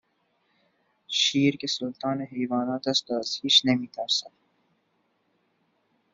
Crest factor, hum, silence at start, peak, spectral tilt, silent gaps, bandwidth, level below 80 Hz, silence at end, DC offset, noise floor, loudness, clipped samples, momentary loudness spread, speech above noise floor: 22 dB; none; 1.1 s; -6 dBFS; -3.5 dB/octave; none; 7.8 kHz; -74 dBFS; 1.85 s; under 0.1%; -72 dBFS; -25 LUFS; under 0.1%; 10 LU; 46 dB